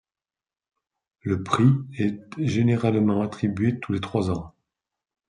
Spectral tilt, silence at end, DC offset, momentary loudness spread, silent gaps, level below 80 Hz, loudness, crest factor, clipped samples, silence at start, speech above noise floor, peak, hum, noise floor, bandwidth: -8 dB/octave; 0.8 s; under 0.1%; 9 LU; none; -58 dBFS; -24 LUFS; 20 dB; under 0.1%; 1.25 s; over 67 dB; -4 dBFS; none; under -90 dBFS; 10.5 kHz